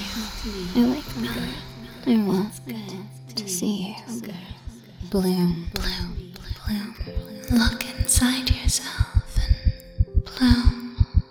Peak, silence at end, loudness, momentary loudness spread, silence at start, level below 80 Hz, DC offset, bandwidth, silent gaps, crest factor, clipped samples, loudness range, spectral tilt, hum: -2 dBFS; 0.05 s; -25 LUFS; 16 LU; 0 s; -28 dBFS; under 0.1%; over 20 kHz; none; 22 dB; under 0.1%; 6 LU; -4.5 dB/octave; none